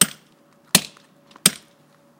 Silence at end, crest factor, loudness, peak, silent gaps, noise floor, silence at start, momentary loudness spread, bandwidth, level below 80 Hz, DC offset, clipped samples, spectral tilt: 0.65 s; 24 dB; -19 LUFS; 0 dBFS; none; -56 dBFS; 0 s; 20 LU; 16.5 kHz; -60 dBFS; under 0.1%; under 0.1%; -1 dB/octave